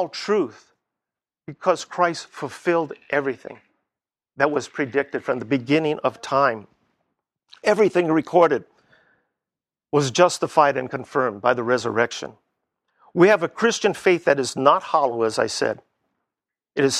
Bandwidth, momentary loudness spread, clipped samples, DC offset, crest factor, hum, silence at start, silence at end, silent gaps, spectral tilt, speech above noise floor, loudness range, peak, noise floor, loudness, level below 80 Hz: 13 kHz; 11 LU; under 0.1%; under 0.1%; 22 dB; none; 0 s; 0 s; none; -4.5 dB/octave; 69 dB; 5 LU; -2 dBFS; -90 dBFS; -21 LUFS; -68 dBFS